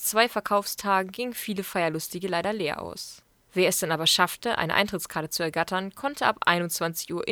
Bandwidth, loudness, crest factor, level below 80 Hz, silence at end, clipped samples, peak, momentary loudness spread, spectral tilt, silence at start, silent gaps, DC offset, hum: over 20 kHz; -26 LUFS; 24 dB; -62 dBFS; 0 s; under 0.1%; -4 dBFS; 9 LU; -3 dB/octave; 0 s; none; under 0.1%; none